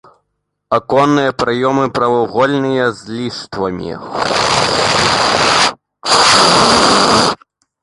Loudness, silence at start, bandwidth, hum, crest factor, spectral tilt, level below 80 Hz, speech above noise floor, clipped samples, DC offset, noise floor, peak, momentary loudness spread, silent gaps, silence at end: -12 LUFS; 0.7 s; 11.5 kHz; none; 14 dB; -3 dB/octave; -42 dBFS; 57 dB; under 0.1%; under 0.1%; -70 dBFS; 0 dBFS; 14 LU; none; 0.5 s